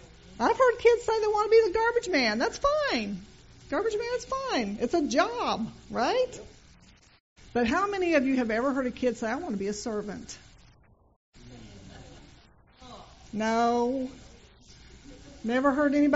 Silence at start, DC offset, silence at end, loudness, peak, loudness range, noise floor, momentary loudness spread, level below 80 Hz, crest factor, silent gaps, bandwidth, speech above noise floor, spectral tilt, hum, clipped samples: 0.05 s; under 0.1%; 0 s; -27 LUFS; -8 dBFS; 12 LU; -59 dBFS; 18 LU; -54 dBFS; 20 dB; 7.20-7.36 s, 11.16-11.33 s; 8 kHz; 33 dB; -3 dB/octave; none; under 0.1%